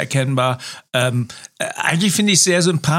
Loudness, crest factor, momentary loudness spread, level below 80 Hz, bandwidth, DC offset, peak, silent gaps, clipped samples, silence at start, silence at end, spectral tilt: -17 LUFS; 16 dB; 13 LU; -58 dBFS; 16.5 kHz; under 0.1%; -2 dBFS; none; under 0.1%; 0 s; 0 s; -3.5 dB/octave